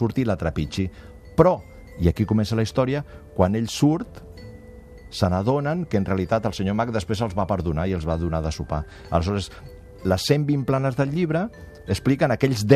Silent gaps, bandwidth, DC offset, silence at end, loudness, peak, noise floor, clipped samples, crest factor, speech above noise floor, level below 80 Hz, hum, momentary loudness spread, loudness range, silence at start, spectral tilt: none; 14 kHz; under 0.1%; 0 s; -23 LUFS; -2 dBFS; -43 dBFS; under 0.1%; 20 dB; 21 dB; -40 dBFS; none; 12 LU; 3 LU; 0 s; -7 dB/octave